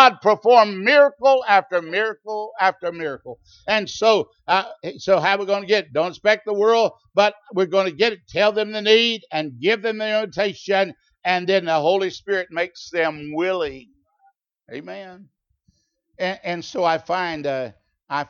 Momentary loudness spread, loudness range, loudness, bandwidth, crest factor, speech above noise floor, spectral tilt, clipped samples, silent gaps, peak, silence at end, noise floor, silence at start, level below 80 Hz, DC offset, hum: 14 LU; 9 LU; -20 LUFS; 7.2 kHz; 20 dB; 45 dB; -4 dB/octave; under 0.1%; none; 0 dBFS; 0.05 s; -65 dBFS; 0 s; -64 dBFS; under 0.1%; none